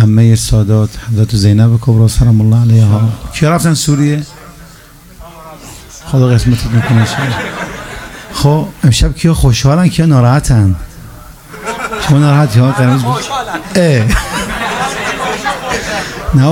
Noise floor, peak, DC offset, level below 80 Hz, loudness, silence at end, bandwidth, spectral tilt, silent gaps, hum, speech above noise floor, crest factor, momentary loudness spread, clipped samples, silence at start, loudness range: -36 dBFS; 0 dBFS; under 0.1%; -24 dBFS; -11 LUFS; 0 s; 16 kHz; -6 dB/octave; none; none; 28 dB; 10 dB; 14 LU; under 0.1%; 0 s; 5 LU